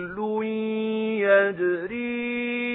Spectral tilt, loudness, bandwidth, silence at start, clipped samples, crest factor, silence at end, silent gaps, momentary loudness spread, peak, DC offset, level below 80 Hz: -10 dB/octave; -25 LUFS; 4 kHz; 0 s; under 0.1%; 18 dB; 0 s; none; 8 LU; -6 dBFS; under 0.1%; -64 dBFS